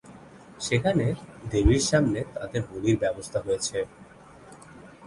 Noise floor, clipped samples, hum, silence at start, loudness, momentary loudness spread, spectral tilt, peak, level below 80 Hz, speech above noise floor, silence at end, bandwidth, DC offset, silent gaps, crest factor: -49 dBFS; under 0.1%; none; 0.05 s; -26 LUFS; 12 LU; -5 dB/octave; -8 dBFS; -38 dBFS; 24 dB; 0 s; 11.5 kHz; under 0.1%; none; 20 dB